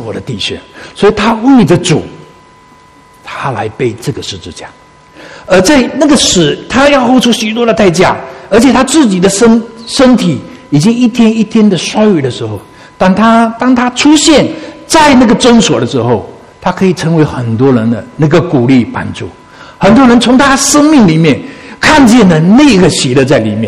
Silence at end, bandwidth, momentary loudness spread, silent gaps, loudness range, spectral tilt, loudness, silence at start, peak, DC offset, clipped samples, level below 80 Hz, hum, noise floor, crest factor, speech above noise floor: 0 s; 14 kHz; 13 LU; none; 6 LU; -5 dB/octave; -7 LUFS; 0 s; 0 dBFS; under 0.1%; 2%; -34 dBFS; none; -39 dBFS; 8 dB; 32 dB